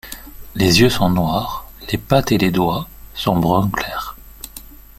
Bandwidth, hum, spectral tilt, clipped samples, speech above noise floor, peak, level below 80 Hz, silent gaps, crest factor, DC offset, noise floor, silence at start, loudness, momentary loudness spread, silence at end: 16.5 kHz; none; -5.5 dB/octave; under 0.1%; 22 dB; 0 dBFS; -38 dBFS; none; 18 dB; under 0.1%; -38 dBFS; 0.05 s; -17 LUFS; 21 LU; 0.25 s